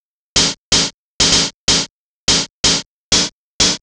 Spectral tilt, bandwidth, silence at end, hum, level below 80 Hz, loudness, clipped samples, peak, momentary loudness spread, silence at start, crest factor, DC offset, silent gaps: -1 dB/octave; 13 kHz; 0.05 s; none; -36 dBFS; -14 LUFS; under 0.1%; -2 dBFS; 8 LU; 0.35 s; 16 dB; under 0.1%; 0.58-0.72 s, 0.94-1.20 s, 1.54-1.68 s, 1.90-2.28 s, 2.50-2.64 s, 2.86-3.12 s, 3.32-3.60 s